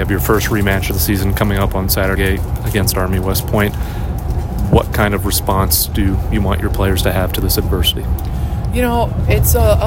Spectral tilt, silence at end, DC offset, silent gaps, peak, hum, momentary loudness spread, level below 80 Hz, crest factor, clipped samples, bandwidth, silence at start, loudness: -5 dB/octave; 0 s; under 0.1%; none; 0 dBFS; none; 7 LU; -20 dBFS; 14 dB; under 0.1%; 17 kHz; 0 s; -16 LUFS